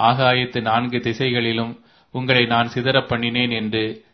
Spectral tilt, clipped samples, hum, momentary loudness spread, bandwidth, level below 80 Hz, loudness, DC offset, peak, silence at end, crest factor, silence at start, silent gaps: -6.5 dB/octave; under 0.1%; none; 8 LU; 6.4 kHz; -54 dBFS; -19 LUFS; under 0.1%; 0 dBFS; 0.15 s; 20 dB; 0 s; none